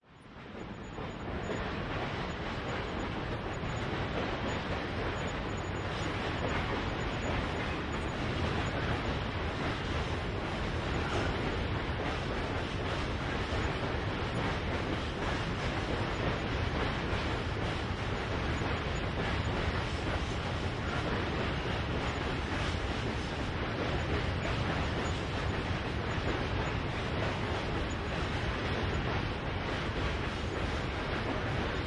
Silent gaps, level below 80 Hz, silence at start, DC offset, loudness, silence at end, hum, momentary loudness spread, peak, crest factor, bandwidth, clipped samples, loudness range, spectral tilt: none; -42 dBFS; 0.1 s; under 0.1%; -34 LUFS; 0 s; none; 3 LU; -20 dBFS; 14 dB; 11 kHz; under 0.1%; 2 LU; -6 dB/octave